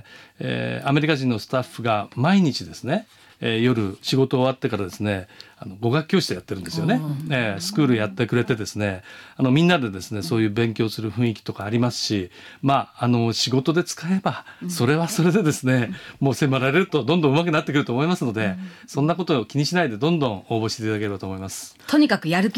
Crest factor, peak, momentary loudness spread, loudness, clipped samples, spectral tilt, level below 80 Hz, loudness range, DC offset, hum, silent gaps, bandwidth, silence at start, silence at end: 16 dB; -6 dBFS; 10 LU; -22 LUFS; under 0.1%; -5.5 dB/octave; -60 dBFS; 3 LU; under 0.1%; none; none; 16.5 kHz; 0.1 s; 0 s